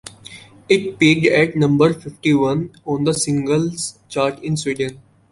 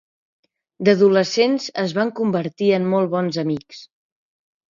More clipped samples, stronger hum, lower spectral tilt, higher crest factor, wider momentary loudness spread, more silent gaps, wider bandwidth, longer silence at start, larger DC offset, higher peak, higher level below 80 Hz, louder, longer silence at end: neither; neither; about the same, -5 dB/octave vs -6 dB/octave; about the same, 16 dB vs 18 dB; first, 11 LU vs 8 LU; neither; first, 11.5 kHz vs 7.4 kHz; second, 0.05 s vs 0.8 s; neither; about the same, -2 dBFS vs -2 dBFS; first, -52 dBFS vs -66 dBFS; about the same, -18 LUFS vs -19 LUFS; second, 0.35 s vs 0.85 s